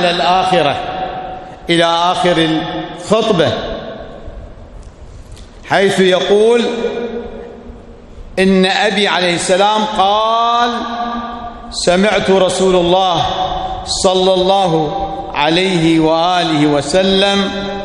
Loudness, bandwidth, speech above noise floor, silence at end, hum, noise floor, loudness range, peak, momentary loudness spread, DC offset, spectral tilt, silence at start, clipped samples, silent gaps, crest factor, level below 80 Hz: -13 LUFS; 11.5 kHz; 21 dB; 0 s; none; -34 dBFS; 4 LU; 0 dBFS; 13 LU; under 0.1%; -4.5 dB/octave; 0 s; under 0.1%; none; 14 dB; -36 dBFS